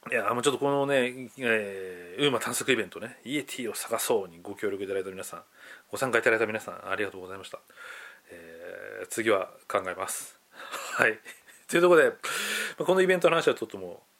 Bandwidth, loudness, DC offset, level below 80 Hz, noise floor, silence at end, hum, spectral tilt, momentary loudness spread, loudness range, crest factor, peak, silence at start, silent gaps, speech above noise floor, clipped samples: 17 kHz; -27 LUFS; under 0.1%; -78 dBFS; -48 dBFS; 0.25 s; none; -3.5 dB/octave; 20 LU; 8 LU; 26 dB; -4 dBFS; 0.05 s; none; 20 dB; under 0.1%